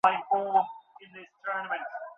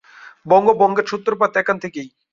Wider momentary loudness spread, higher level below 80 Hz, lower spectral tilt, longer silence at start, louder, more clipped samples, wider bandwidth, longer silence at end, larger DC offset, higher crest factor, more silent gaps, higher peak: first, 23 LU vs 12 LU; second, -76 dBFS vs -62 dBFS; second, -4.5 dB/octave vs -6 dB/octave; second, 0.05 s vs 0.25 s; second, -29 LUFS vs -17 LUFS; neither; second, 6.6 kHz vs 7.4 kHz; second, 0.05 s vs 0.25 s; neither; first, 22 dB vs 16 dB; neither; second, -8 dBFS vs -2 dBFS